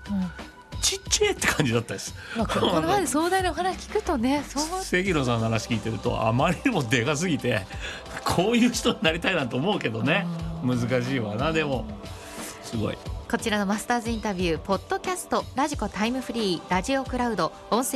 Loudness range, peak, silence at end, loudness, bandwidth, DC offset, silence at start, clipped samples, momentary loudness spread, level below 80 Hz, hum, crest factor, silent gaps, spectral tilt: 4 LU; -6 dBFS; 0 s; -25 LUFS; 13 kHz; under 0.1%; 0 s; under 0.1%; 9 LU; -44 dBFS; none; 18 dB; none; -4.5 dB/octave